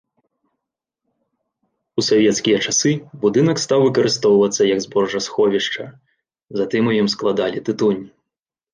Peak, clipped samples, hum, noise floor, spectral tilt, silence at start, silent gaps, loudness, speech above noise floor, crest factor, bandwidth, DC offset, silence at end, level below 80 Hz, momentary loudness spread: -4 dBFS; under 0.1%; none; -85 dBFS; -4 dB/octave; 1.95 s; none; -18 LUFS; 68 dB; 16 dB; 10 kHz; under 0.1%; 0.65 s; -62 dBFS; 9 LU